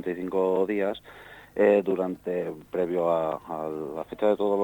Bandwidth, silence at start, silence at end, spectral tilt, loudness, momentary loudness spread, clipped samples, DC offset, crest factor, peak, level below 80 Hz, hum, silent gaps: 19 kHz; 0 s; 0 s; -7.5 dB/octave; -27 LUFS; 13 LU; under 0.1%; under 0.1%; 18 dB; -10 dBFS; -62 dBFS; 50 Hz at -60 dBFS; none